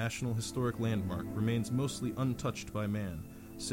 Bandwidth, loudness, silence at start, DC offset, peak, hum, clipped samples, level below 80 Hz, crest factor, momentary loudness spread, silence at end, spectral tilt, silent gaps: 17 kHz; -35 LUFS; 0 s; under 0.1%; -20 dBFS; none; under 0.1%; -56 dBFS; 14 dB; 8 LU; 0 s; -6 dB/octave; none